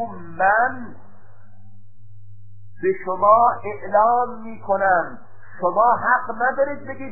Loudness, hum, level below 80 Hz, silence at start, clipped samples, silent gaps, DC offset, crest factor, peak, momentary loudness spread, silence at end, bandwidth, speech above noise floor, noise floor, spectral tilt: -19 LUFS; none; -54 dBFS; 0 s; under 0.1%; none; 2%; 18 dB; -2 dBFS; 15 LU; 0 s; 2.7 kHz; 30 dB; -49 dBFS; -13 dB/octave